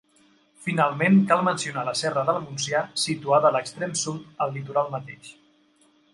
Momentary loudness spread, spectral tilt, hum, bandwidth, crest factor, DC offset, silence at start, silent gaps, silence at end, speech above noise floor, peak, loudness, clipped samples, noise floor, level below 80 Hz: 12 LU; -4.5 dB/octave; none; 11.5 kHz; 20 dB; under 0.1%; 0.6 s; none; 0.85 s; 37 dB; -4 dBFS; -24 LUFS; under 0.1%; -61 dBFS; -70 dBFS